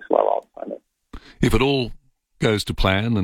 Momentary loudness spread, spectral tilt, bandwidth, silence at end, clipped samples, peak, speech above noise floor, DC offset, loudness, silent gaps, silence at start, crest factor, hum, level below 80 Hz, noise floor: 15 LU; -6 dB/octave; 16.5 kHz; 0 s; under 0.1%; -4 dBFS; 23 dB; under 0.1%; -21 LUFS; none; 0 s; 18 dB; none; -32 dBFS; -42 dBFS